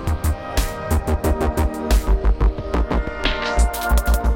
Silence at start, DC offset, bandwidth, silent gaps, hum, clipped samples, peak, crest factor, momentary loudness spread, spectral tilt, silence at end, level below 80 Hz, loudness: 0 s; under 0.1%; 17 kHz; none; none; under 0.1%; -4 dBFS; 14 dB; 4 LU; -5.5 dB/octave; 0 s; -20 dBFS; -21 LUFS